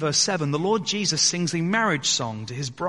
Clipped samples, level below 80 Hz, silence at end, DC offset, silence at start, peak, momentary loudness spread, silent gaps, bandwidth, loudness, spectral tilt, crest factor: under 0.1%; -62 dBFS; 0 s; 0.1%; 0 s; -6 dBFS; 8 LU; none; 11.5 kHz; -22 LUFS; -3 dB/octave; 18 dB